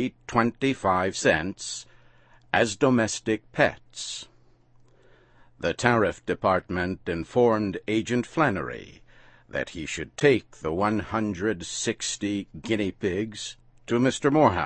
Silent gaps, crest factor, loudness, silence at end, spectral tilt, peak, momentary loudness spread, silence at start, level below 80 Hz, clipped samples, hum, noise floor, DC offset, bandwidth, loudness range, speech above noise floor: none; 24 dB; -26 LUFS; 0 s; -4.5 dB/octave; -2 dBFS; 12 LU; 0 s; -54 dBFS; under 0.1%; none; -57 dBFS; under 0.1%; 8.8 kHz; 3 LU; 32 dB